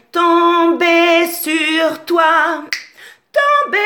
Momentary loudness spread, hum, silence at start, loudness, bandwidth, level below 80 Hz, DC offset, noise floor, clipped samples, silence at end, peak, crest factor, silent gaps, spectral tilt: 8 LU; none; 0.15 s; -13 LUFS; 19.5 kHz; -72 dBFS; under 0.1%; -41 dBFS; under 0.1%; 0 s; 0 dBFS; 14 dB; none; -1.5 dB/octave